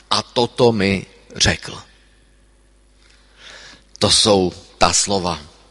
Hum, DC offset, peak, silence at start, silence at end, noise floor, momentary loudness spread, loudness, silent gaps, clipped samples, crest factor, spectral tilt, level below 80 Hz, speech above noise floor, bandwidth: 50 Hz at -50 dBFS; under 0.1%; 0 dBFS; 0.1 s; 0.25 s; -53 dBFS; 22 LU; -17 LUFS; none; under 0.1%; 20 dB; -3 dB/octave; -40 dBFS; 36 dB; 11.5 kHz